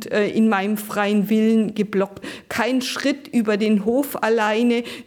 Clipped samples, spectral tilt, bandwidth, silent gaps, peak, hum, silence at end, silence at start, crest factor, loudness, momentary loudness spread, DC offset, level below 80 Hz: under 0.1%; -5.5 dB/octave; 19 kHz; none; -8 dBFS; none; 0.05 s; 0 s; 12 dB; -20 LUFS; 5 LU; under 0.1%; -62 dBFS